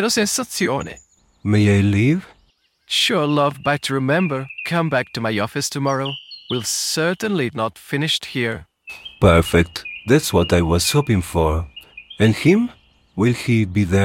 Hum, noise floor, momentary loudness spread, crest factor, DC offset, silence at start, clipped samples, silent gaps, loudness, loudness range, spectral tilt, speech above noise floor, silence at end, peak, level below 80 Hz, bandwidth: none; -60 dBFS; 11 LU; 18 dB; under 0.1%; 0 s; under 0.1%; none; -19 LUFS; 4 LU; -5 dB/octave; 42 dB; 0 s; -2 dBFS; -38 dBFS; 17 kHz